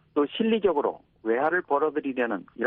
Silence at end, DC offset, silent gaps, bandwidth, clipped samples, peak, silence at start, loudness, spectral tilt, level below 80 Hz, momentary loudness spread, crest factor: 0 s; under 0.1%; none; 4 kHz; under 0.1%; -12 dBFS; 0.15 s; -26 LUFS; -3 dB/octave; -64 dBFS; 6 LU; 14 dB